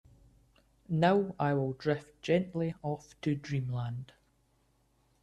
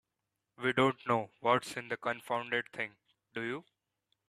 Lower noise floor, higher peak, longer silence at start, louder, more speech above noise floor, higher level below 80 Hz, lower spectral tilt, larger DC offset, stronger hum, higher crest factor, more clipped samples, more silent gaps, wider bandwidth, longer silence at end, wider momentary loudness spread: second, -71 dBFS vs -87 dBFS; about the same, -14 dBFS vs -12 dBFS; first, 0.9 s vs 0.6 s; about the same, -32 LUFS vs -34 LUFS; second, 40 dB vs 53 dB; first, -64 dBFS vs -76 dBFS; first, -7.5 dB/octave vs -5 dB/octave; neither; neither; about the same, 20 dB vs 24 dB; neither; neither; second, 10.5 kHz vs 14.5 kHz; first, 1.2 s vs 0.7 s; about the same, 11 LU vs 11 LU